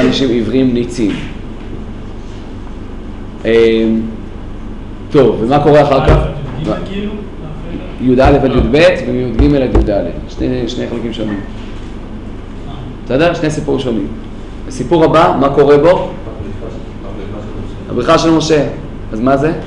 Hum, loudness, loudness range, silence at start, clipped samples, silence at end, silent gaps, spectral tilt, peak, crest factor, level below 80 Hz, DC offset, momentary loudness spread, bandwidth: none; -12 LUFS; 6 LU; 0 s; under 0.1%; 0 s; none; -6.5 dB/octave; 0 dBFS; 12 dB; -24 dBFS; under 0.1%; 20 LU; 11 kHz